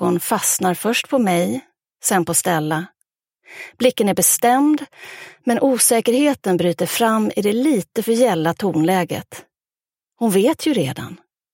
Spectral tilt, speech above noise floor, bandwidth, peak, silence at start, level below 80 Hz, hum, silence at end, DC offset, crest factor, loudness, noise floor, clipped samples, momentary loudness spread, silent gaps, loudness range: -4 dB/octave; over 72 dB; 17 kHz; -2 dBFS; 0 s; -64 dBFS; none; 0.4 s; under 0.1%; 18 dB; -18 LUFS; under -90 dBFS; under 0.1%; 15 LU; none; 3 LU